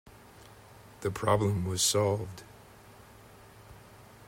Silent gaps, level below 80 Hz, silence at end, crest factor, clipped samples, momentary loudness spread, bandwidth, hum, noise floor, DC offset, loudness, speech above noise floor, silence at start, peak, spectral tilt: none; -60 dBFS; 0 s; 20 dB; under 0.1%; 27 LU; 16 kHz; none; -54 dBFS; under 0.1%; -29 LUFS; 25 dB; 0.05 s; -12 dBFS; -4 dB/octave